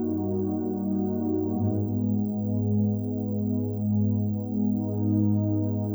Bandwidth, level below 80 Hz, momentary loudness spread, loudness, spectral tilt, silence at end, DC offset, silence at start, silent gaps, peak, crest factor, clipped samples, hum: over 20 kHz; -64 dBFS; 4 LU; -27 LUFS; -15 dB/octave; 0 s; under 0.1%; 0 s; none; -14 dBFS; 12 dB; under 0.1%; none